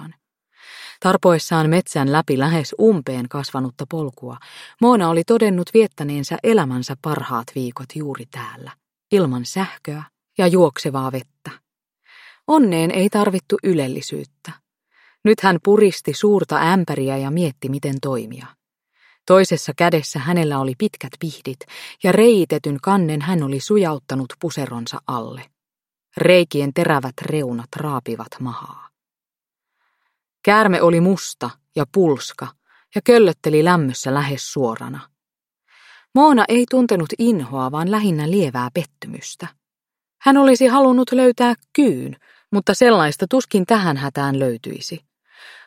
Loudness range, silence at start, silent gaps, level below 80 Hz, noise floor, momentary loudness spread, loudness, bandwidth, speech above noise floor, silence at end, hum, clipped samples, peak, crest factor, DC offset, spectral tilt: 5 LU; 0 s; none; -64 dBFS; under -90 dBFS; 18 LU; -18 LUFS; 16.5 kHz; over 73 dB; 0.15 s; none; under 0.1%; 0 dBFS; 18 dB; under 0.1%; -6 dB/octave